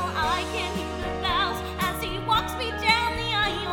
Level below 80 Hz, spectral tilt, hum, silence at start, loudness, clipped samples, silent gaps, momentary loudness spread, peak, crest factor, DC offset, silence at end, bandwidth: -40 dBFS; -3.5 dB/octave; none; 0 s; -25 LUFS; under 0.1%; none; 8 LU; -4 dBFS; 22 dB; under 0.1%; 0 s; 18 kHz